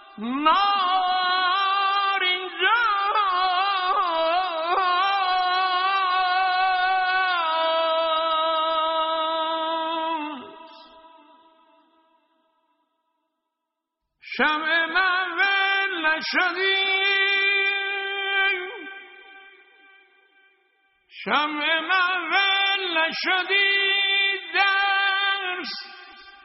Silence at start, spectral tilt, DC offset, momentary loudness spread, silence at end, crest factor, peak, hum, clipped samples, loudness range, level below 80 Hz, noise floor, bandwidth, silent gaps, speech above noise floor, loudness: 0.15 s; 3 dB/octave; under 0.1%; 7 LU; 0.15 s; 18 dB; -6 dBFS; none; under 0.1%; 9 LU; -68 dBFS; -83 dBFS; 6 kHz; none; 60 dB; -21 LUFS